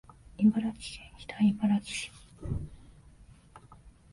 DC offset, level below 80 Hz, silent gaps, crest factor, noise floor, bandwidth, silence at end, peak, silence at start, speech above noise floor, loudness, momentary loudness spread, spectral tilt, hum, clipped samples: under 0.1%; -52 dBFS; none; 18 dB; -55 dBFS; 11.5 kHz; 0.25 s; -14 dBFS; 0.4 s; 26 dB; -30 LUFS; 18 LU; -6 dB/octave; none; under 0.1%